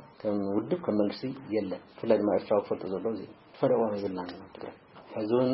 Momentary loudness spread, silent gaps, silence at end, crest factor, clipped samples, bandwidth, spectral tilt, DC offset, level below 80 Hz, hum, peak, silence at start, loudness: 15 LU; none; 0 s; 20 dB; under 0.1%; 5.8 kHz; -11 dB/octave; under 0.1%; -70 dBFS; none; -10 dBFS; 0 s; -30 LUFS